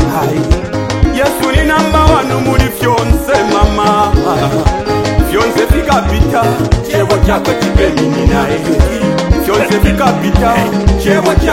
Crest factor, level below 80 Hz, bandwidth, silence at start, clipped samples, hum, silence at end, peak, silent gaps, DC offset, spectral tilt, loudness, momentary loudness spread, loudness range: 10 dB; -16 dBFS; 17 kHz; 0 s; 0.9%; none; 0 s; 0 dBFS; none; 0.3%; -6 dB/octave; -11 LUFS; 3 LU; 1 LU